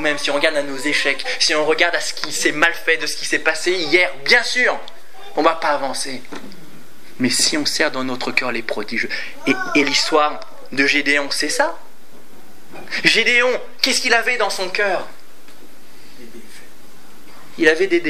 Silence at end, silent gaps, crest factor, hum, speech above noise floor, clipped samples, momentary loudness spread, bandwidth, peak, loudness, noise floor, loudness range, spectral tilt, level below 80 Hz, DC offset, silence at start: 0 s; none; 20 dB; none; 28 dB; under 0.1%; 10 LU; 16 kHz; 0 dBFS; -17 LUFS; -47 dBFS; 4 LU; -1.5 dB/octave; -66 dBFS; 5%; 0 s